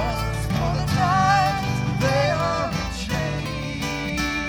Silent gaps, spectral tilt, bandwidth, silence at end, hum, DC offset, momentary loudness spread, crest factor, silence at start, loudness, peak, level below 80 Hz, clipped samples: none; -5.5 dB/octave; over 20 kHz; 0 s; none; under 0.1%; 8 LU; 14 dB; 0 s; -23 LUFS; -8 dBFS; -34 dBFS; under 0.1%